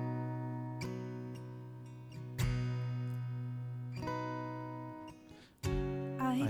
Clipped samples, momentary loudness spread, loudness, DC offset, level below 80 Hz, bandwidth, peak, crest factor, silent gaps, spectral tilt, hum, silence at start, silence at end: under 0.1%; 13 LU; -41 LUFS; under 0.1%; -52 dBFS; 15.5 kHz; -22 dBFS; 18 dB; none; -7 dB/octave; none; 0 s; 0 s